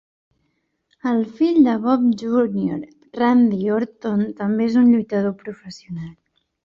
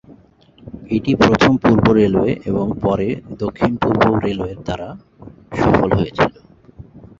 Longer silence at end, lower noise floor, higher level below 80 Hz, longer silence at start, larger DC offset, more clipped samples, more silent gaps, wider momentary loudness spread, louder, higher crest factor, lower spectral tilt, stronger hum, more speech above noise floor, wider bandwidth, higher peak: first, 0.55 s vs 0.15 s; first, -70 dBFS vs -48 dBFS; second, -60 dBFS vs -38 dBFS; first, 1.05 s vs 0.1 s; neither; neither; neither; first, 18 LU vs 14 LU; about the same, -19 LUFS vs -17 LUFS; about the same, 16 dB vs 16 dB; about the same, -8 dB/octave vs -7.5 dB/octave; neither; first, 52 dB vs 32 dB; about the same, 7.2 kHz vs 7.6 kHz; second, -4 dBFS vs 0 dBFS